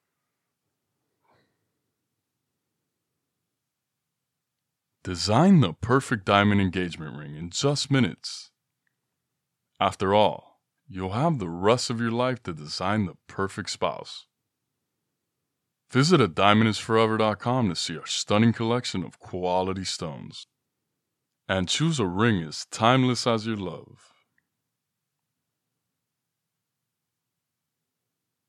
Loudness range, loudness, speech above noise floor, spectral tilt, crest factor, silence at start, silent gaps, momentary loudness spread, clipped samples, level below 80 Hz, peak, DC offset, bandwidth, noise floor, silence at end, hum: 7 LU; -24 LUFS; 59 dB; -5.5 dB/octave; 26 dB; 5.05 s; none; 16 LU; under 0.1%; -62 dBFS; -2 dBFS; under 0.1%; 12 kHz; -84 dBFS; 4.65 s; none